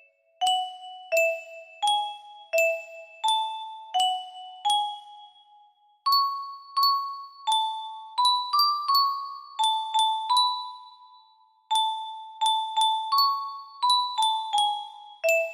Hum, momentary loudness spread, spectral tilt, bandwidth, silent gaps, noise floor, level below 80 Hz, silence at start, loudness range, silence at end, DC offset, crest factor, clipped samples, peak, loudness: none; 14 LU; 3 dB/octave; 15.5 kHz; none; -60 dBFS; -82 dBFS; 0.4 s; 3 LU; 0 s; under 0.1%; 16 dB; under 0.1%; -10 dBFS; -25 LUFS